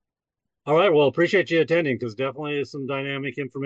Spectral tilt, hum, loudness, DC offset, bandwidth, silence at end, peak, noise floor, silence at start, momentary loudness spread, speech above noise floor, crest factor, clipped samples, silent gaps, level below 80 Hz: -6.5 dB/octave; none; -22 LUFS; under 0.1%; 7.8 kHz; 0 s; -8 dBFS; -85 dBFS; 0.65 s; 10 LU; 62 dB; 14 dB; under 0.1%; none; -72 dBFS